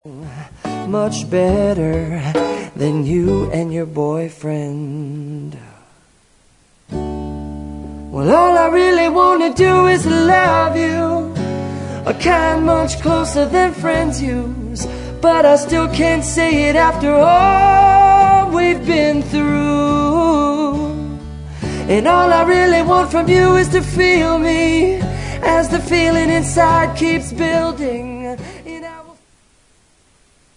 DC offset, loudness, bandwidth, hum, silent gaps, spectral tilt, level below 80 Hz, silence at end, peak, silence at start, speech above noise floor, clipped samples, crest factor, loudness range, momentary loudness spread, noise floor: under 0.1%; -14 LUFS; 11 kHz; none; none; -5.5 dB/octave; -32 dBFS; 1.45 s; 0 dBFS; 0.05 s; 40 dB; under 0.1%; 14 dB; 10 LU; 16 LU; -54 dBFS